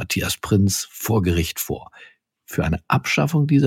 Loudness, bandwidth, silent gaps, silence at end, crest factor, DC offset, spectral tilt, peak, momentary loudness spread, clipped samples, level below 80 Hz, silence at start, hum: -21 LUFS; 17 kHz; none; 0 s; 16 dB; under 0.1%; -5 dB/octave; -6 dBFS; 8 LU; under 0.1%; -40 dBFS; 0 s; none